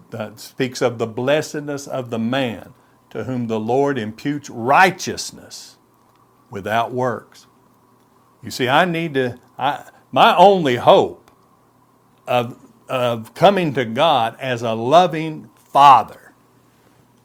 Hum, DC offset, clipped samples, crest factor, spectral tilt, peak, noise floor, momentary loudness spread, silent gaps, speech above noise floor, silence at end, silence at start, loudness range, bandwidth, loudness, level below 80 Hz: none; under 0.1%; under 0.1%; 18 dB; -5 dB/octave; 0 dBFS; -55 dBFS; 19 LU; none; 38 dB; 1.1 s; 0.15 s; 7 LU; 17 kHz; -17 LUFS; -64 dBFS